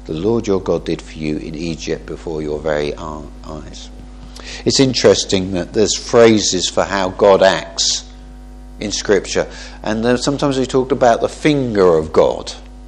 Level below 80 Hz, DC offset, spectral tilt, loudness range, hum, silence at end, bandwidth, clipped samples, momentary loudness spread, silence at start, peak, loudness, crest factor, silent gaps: -36 dBFS; under 0.1%; -4 dB/octave; 9 LU; none; 0 s; 10.5 kHz; under 0.1%; 18 LU; 0 s; 0 dBFS; -16 LUFS; 16 dB; none